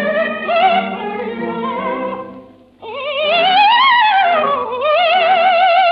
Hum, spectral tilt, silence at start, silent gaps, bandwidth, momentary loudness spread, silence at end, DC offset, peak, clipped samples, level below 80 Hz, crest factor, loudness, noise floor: none; -6 dB/octave; 0 s; none; 5.6 kHz; 13 LU; 0 s; under 0.1%; 0 dBFS; under 0.1%; -62 dBFS; 14 dB; -13 LUFS; -39 dBFS